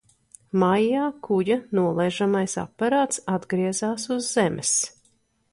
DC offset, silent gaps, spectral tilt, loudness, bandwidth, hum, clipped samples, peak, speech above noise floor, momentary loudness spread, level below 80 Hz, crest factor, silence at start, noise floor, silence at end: under 0.1%; none; -4.5 dB/octave; -24 LUFS; 11.5 kHz; none; under 0.1%; -8 dBFS; 42 dB; 5 LU; -62 dBFS; 16 dB; 0.55 s; -65 dBFS; 0.65 s